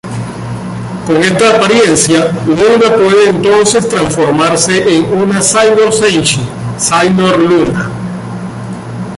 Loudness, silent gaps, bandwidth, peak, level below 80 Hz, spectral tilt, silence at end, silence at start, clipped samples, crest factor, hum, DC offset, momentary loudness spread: -9 LUFS; none; 11.5 kHz; 0 dBFS; -40 dBFS; -4 dB/octave; 0 s; 0.05 s; under 0.1%; 10 dB; none; under 0.1%; 14 LU